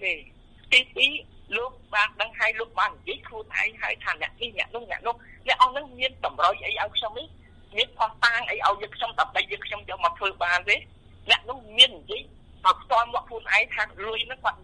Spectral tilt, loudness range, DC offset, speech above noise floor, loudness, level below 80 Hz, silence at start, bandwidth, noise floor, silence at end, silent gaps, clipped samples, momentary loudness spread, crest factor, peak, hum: -1 dB/octave; 4 LU; under 0.1%; 24 dB; -24 LUFS; -52 dBFS; 0 s; 11 kHz; -50 dBFS; 0.1 s; none; under 0.1%; 13 LU; 22 dB; -4 dBFS; none